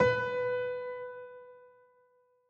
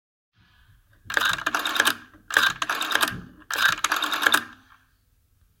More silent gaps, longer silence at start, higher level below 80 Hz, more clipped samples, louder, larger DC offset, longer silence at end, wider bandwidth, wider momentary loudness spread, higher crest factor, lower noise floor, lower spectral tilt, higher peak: neither; second, 0 s vs 1.05 s; second, -66 dBFS vs -58 dBFS; neither; second, -34 LUFS vs -23 LUFS; neither; second, 0.85 s vs 1.05 s; second, 7 kHz vs 17 kHz; first, 21 LU vs 8 LU; second, 20 dB vs 26 dB; first, -69 dBFS vs -64 dBFS; first, -6 dB/octave vs -0.5 dB/octave; second, -14 dBFS vs 0 dBFS